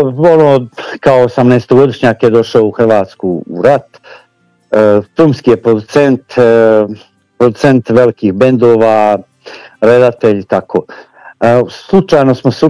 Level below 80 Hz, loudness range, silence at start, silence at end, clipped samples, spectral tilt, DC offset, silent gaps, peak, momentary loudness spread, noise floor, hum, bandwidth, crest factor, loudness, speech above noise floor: -46 dBFS; 2 LU; 0 s; 0 s; 5%; -7.5 dB/octave; under 0.1%; none; 0 dBFS; 7 LU; -52 dBFS; none; 11 kHz; 10 dB; -9 LUFS; 44 dB